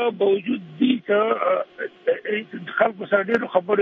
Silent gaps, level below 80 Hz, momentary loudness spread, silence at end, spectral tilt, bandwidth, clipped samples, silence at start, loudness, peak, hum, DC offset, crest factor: none; -74 dBFS; 8 LU; 0 s; -7.5 dB/octave; 5.8 kHz; under 0.1%; 0 s; -22 LUFS; -4 dBFS; none; under 0.1%; 18 dB